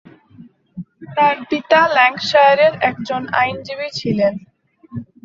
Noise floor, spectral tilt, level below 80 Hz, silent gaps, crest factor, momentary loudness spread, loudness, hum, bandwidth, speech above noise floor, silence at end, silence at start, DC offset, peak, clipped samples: -44 dBFS; -5 dB/octave; -58 dBFS; none; 16 dB; 21 LU; -16 LUFS; none; 7.6 kHz; 29 dB; 0.2 s; 0.4 s; under 0.1%; -2 dBFS; under 0.1%